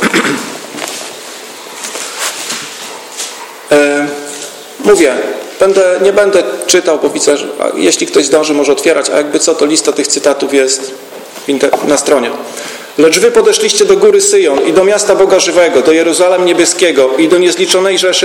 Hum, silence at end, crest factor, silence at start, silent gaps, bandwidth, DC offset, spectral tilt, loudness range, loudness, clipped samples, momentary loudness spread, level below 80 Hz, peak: none; 0 s; 10 dB; 0 s; none; 17 kHz; under 0.1%; -2 dB/octave; 8 LU; -9 LUFS; 0.2%; 15 LU; -52 dBFS; 0 dBFS